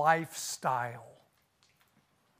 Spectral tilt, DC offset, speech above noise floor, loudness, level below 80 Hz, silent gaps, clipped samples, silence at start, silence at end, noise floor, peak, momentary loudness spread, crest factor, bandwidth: -3.5 dB/octave; under 0.1%; 39 dB; -33 LUFS; -82 dBFS; none; under 0.1%; 0 s; 1.3 s; -71 dBFS; -12 dBFS; 12 LU; 22 dB; 15.5 kHz